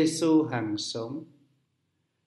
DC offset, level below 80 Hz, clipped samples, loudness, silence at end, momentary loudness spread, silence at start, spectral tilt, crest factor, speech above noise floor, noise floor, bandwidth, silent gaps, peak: under 0.1%; -74 dBFS; under 0.1%; -27 LUFS; 1 s; 14 LU; 0 s; -5 dB/octave; 16 dB; 49 dB; -76 dBFS; 12 kHz; none; -12 dBFS